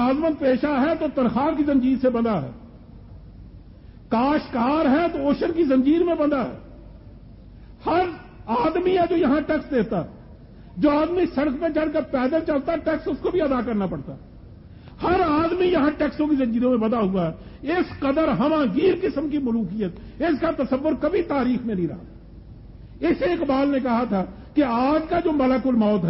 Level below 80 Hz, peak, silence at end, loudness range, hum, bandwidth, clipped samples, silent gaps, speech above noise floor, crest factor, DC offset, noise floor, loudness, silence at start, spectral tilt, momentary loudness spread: -44 dBFS; -8 dBFS; 0 s; 3 LU; none; 5.8 kHz; under 0.1%; none; 23 dB; 14 dB; under 0.1%; -44 dBFS; -22 LUFS; 0 s; -11.5 dB/octave; 8 LU